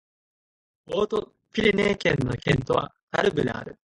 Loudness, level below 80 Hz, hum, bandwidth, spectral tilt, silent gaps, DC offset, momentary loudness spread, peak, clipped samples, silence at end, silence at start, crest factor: -25 LUFS; -48 dBFS; none; 11 kHz; -6 dB/octave; 3.03-3.07 s; under 0.1%; 9 LU; -6 dBFS; under 0.1%; 0.3 s; 0.9 s; 20 dB